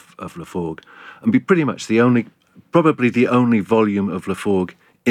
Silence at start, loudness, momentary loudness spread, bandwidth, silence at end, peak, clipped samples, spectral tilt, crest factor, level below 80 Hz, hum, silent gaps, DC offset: 0.2 s; -18 LUFS; 14 LU; 11.5 kHz; 0 s; -2 dBFS; under 0.1%; -7 dB/octave; 18 dB; -60 dBFS; none; none; under 0.1%